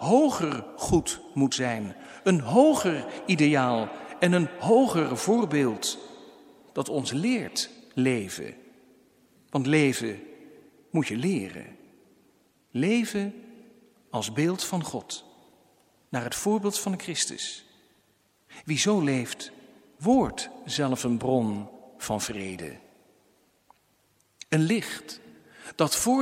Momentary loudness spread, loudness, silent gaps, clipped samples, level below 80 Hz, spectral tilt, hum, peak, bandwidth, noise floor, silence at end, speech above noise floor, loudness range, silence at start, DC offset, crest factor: 17 LU; -26 LUFS; none; under 0.1%; -58 dBFS; -4.5 dB/octave; none; -6 dBFS; 16.5 kHz; -67 dBFS; 0 s; 41 dB; 8 LU; 0 s; under 0.1%; 22 dB